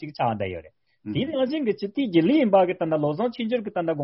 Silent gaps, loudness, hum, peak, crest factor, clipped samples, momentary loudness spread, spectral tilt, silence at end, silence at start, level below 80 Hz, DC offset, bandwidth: none; -24 LUFS; none; -6 dBFS; 18 dB; under 0.1%; 12 LU; -5.5 dB/octave; 0 s; 0 s; -62 dBFS; under 0.1%; 5.8 kHz